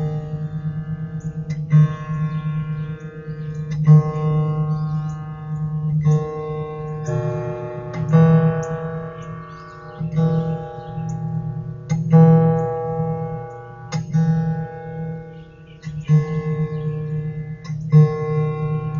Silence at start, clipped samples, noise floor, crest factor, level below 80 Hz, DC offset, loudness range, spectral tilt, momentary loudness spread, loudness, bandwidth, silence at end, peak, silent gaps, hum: 0 s; under 0.1%; -40 dBFS; 18 dB; -46 dBFS; under 0.1%; 6 LU; -9.5 dB/octave; 16 LU; -21 LUFS; 7 kHz; 0 s; -2 dBFS; none; none